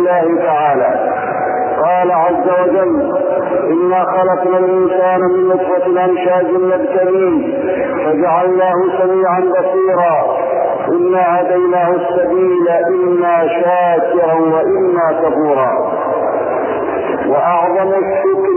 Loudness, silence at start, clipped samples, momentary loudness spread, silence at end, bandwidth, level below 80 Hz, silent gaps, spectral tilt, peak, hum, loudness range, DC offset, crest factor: -13 LUFS; 0 s; under 0.1%; 4 LU; 0 s; 3.2 kHz; -54 dBFS; none; -10.5 dB/octave; -2 dBFS; none; 1 LU; under 0.1%; 10 dB